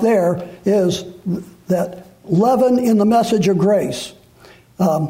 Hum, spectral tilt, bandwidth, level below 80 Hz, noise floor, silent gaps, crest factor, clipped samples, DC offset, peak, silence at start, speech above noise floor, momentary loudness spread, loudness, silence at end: none; -6.5 dB/octave; 16 kHz; -54 dBFS; -46 dBFS; none; 12 dB; under 0.1%; under 0.1%; -6 dBFS; 0 s; 30 dB; 13 LU; -17 LUFS; 0 s